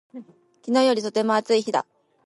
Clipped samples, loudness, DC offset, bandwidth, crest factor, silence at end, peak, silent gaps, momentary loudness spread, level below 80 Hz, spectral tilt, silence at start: under 0.1%; -22 LUFS; under 0.1%; 11.5 kHz; 16 dB; 0.45 s; -8 dBFS; none; 14 LU; -76 dBFS; -4 dB/octave; 0.15 s